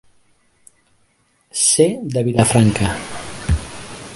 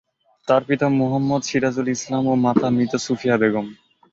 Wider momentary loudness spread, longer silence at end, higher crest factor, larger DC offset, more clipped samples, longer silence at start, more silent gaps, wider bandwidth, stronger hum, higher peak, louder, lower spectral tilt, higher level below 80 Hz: first, 16 LU vs 5 LU; second, 0 s vs 0.4 s; about the same, 20 dB vs 18 dB; neither; neither; first, 1.55 s vs 0.45 s; neither; first, 11.5 kHz vs 7.8 kHz; neither; about the same, 0 dBFS vs -2 dBFS; first, -17 LUFS vs -20 LUFS; second, -4.5 dB/octave vs -6 dB/octave; first, -32 dBFS vs -58 dBFS